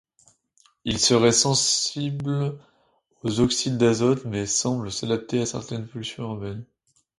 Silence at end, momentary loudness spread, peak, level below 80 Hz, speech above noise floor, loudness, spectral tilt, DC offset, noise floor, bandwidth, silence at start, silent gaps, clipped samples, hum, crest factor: 0.55 s; 15 LU; -6 dBFS; -54 dBFS; 42 dB; -23 LUFS; -4 dB/octave; under 0.1%; -65 dBFS; 11.5 kHz; 0.85 s; none; under 0.1%; none; 18 dB